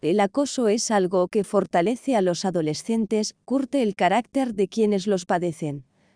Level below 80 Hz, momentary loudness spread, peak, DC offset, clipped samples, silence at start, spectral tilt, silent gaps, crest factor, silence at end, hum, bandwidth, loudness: -66 dBFS; 5 LU; -8 dBFS; under 0.1%; under 0.1%; 0 s; -5 dB/octave; none; 16 dB; 0.35 s; none; 10.5 kHz; -23 LUFS